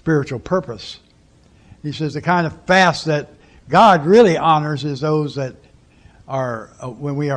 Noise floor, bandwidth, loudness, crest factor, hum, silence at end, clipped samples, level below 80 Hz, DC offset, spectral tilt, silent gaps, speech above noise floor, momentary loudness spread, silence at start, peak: -51 dBFS; 10.5 kHz; -17 LUFS; 16 dB; none; 0 s; under 0.1%; -50 dBFS; under 0.1%; -6 dB/octave; none; 35 dB; 18 LU; 0.05 s; -2 dBFS